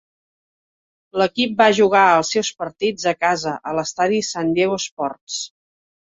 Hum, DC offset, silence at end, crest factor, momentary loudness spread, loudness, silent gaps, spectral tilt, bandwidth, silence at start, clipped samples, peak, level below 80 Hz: none; under 0.1%; 0.65 s; 18 dB; 14 LU; -19 LUFS; 4.91-4.97 s, 5.21-5.27 s; -3.5 dB/octave; 8 kHz; 1.15 s; under 0.1%; -2 dBFS; -60 dBFS